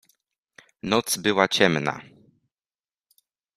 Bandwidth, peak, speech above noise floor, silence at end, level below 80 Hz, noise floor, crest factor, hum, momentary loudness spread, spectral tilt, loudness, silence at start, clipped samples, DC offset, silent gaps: 14.5 kHz; -2 dBFS; over 68 dB; 1.55 s; -64 dBFS; under -90 dBFS; 24 dB; none; 15 LU; -3.5 dB/octave; -22 LUFS; 0.85 s; under 0.1%; under 0.1%; none